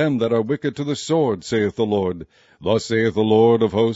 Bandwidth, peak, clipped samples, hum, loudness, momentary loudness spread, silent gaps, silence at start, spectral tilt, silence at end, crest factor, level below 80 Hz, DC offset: 8 kHz; -4 dBFS; under 0.1%; none; -20 LUFS; 10 LU; none; 0 s; -6 dB/octave; 0 s; 16 dB; -54 dBFS; under 0.1%